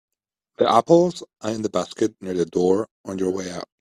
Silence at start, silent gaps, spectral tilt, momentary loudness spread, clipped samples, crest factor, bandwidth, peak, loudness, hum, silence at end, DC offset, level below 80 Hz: 0.6 s; 2.91-3.04 s; -6 dB/octave; 13 LU; under 0.1%; 20 dB; 11 kHz; -2 dBFS; -22 LUFS; none; 0.15 s; under 0.1%; -62 dBFS